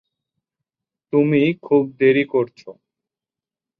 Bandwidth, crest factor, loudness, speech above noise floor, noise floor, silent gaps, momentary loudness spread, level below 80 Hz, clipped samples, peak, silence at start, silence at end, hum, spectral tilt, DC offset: 5.4 kHz; 16 dB; -18 LUFS; 72 dB; -89 dBFS; none; 6 LU; -68 dBFS; under 0.1%; -4 dBFS; 1.15 s; 1.05 s; none; -9 dB/octave; under 0.1%